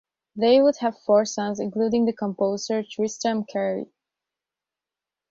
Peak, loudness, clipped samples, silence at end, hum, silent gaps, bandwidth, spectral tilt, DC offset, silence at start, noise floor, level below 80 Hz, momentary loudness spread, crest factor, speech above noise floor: -6 dBFS; -23 LUFS; under 0.1%; 1.45 s; none; none; 7.8 kHz; -5 dB/octave; under 0.1%; 0.35 s; -89 dBFS; -66 dBFS; 10 LU; 18 dB; 67 dB